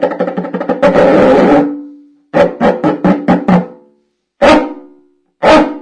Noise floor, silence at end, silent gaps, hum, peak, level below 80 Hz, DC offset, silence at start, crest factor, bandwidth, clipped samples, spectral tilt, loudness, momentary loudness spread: -58 dBFS; 0 s; none; none; 0 dBFS; -38 dBFS; under 0.1%; 0 s; 10 dB; 10.5 kHz; under 0.1%; -7 dB/octave; -10 LUFS; 11 LU